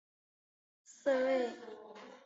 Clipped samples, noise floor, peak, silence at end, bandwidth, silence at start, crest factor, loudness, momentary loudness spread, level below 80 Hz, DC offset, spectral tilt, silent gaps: under 0.1%; -53 dBFS; -20 dBFS; 0.1 s; 8 kHz; 0.9 s; 18 dB; -34 LUFS; 19 LU; -86 dBFS; under 0.1%; -1.5 dB/octave; none